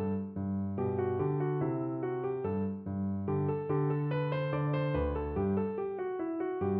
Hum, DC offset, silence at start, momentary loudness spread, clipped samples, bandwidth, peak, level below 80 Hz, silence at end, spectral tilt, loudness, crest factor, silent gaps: none; under 0.1%; 0 s; 4 LU; under 0.1%; 4.5 kHz; -20 dBFS; -50 dBFS; 0 s; -8.5 dB/octave; -33 LUFS; 12 dB; none